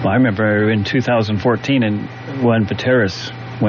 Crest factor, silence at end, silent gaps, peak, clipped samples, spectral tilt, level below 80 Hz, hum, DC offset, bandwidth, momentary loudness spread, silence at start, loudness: 12 dB; 0 s; none; -4 dBFS; under 0.1%; -5.5 dB/octave; -50 dBFS; none; under 0.1%; 7.2 kHz; 9 LU; 0 s; -16 LUFS